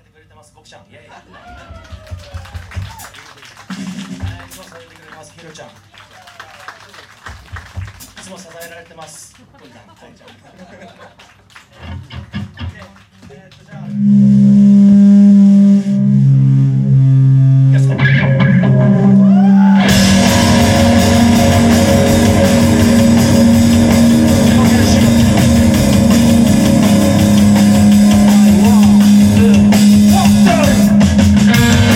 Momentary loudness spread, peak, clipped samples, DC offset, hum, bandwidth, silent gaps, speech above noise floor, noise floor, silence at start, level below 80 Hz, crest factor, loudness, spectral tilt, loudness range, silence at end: 20 LU; 0 dBFS; under 0.1%; under 0.1%; none; 16.5 kHz; none; 21 dB; -41 dBFS; 1.7 s; -32 dBFS; 10 dB; -9 LUFS; -6 dB/octave; 21 LU; 0 s